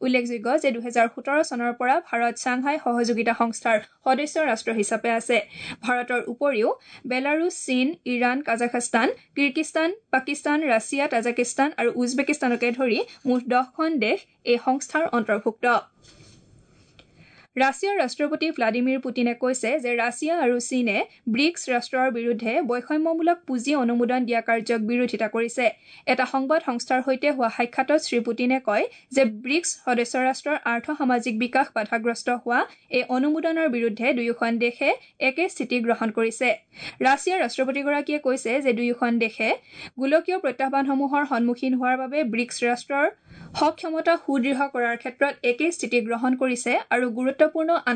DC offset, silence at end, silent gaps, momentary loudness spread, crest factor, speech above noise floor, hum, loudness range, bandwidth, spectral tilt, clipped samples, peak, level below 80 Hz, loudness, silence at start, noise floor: under 0.1%; 0 s; none; 3 LU; 16 dB; 32 dB; none; 1 LU; 9.4 kHz; -3.5 dB/octave; under 0.1%; -8 dBFS; -72 dBFS; -24 LUFS; 0 s; -55 dBFS